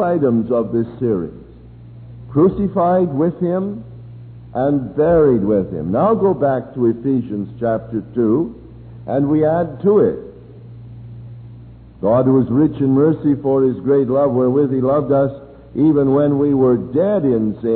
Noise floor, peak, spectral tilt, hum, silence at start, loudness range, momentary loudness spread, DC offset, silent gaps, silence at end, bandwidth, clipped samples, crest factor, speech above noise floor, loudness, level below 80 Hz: -39 dBFS; -4 dBFS; -13.5 dB/octave; none; 0 s; 4 LU; 18 LU; under 0.1%; none; 0 s; 4.3 kHz; under 0.1%; 14 dB; 23 dB; -16 LUFS; -44 dBFS